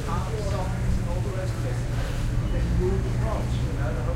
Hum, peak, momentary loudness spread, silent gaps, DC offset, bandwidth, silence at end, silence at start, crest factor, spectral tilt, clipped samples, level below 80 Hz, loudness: none; -12 dBFS; 3 LU; none; under 0.1%; 14 kHz; 0 s; 0 s; 12 dB; -7 dB/octave; under 0.1%; -28 dBFS; -27 LUFS